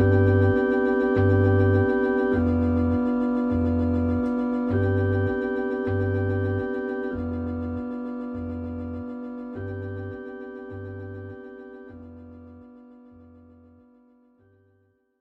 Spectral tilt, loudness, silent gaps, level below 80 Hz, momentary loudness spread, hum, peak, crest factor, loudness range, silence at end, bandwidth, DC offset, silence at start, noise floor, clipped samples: -10.5 dB/octave; -24 LUFS; none; -44 dBFS; 19 LU; none; -8 dBFS; 16 dB; 19 LU; 2.35 s; 4.3 kHz; under 0.1%; 0 s; -66 dBFS; under 0.1%